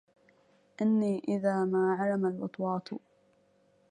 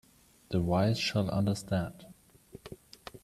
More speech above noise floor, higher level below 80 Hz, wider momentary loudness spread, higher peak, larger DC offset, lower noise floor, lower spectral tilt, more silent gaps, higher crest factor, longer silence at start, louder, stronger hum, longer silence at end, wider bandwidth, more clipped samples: first, 38 dB vs 25 dB; second, -76 dBFS vs -58 dBFS; second, 8 LU vs 21 LU; about the same, -16 dBFS vs -16 dBFS; neither; first, -67 dBFS vs -55 dBFS; first, -8.5 dB/octave vs -6 dB/octave; neither; about the same, 16 dB vs 18 dB; first, 0.8 s vs 0.5 s; about the same, -30 LUFS vs -31 LUFS; neither; first, 0.9 s vs 0.05 s; second, 9.8 kHz vs 14 kHz; neither